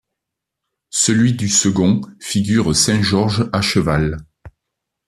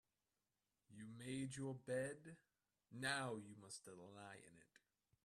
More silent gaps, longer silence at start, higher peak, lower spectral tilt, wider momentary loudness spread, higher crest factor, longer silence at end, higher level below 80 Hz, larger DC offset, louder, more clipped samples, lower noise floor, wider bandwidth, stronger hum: neither; about the same, 0.95 s vs 0.9 s; first, -2 dBFS vs -30 dBFS; about the same, -4 dB/octave vs -4.5 dB/octave; second, 8 LU vs 18 LU; second, 16 dB vs 22 dB; about the same, 0.6 s vs 0.6 s; first, -42 dBFS vs -86 dBFS; neither; first, -16 LUFS vs -50 LUFS; neither; second, -81 dBFS vs under -90 dBFS; about the same, 14 kHz vs 13.5 kHz; neither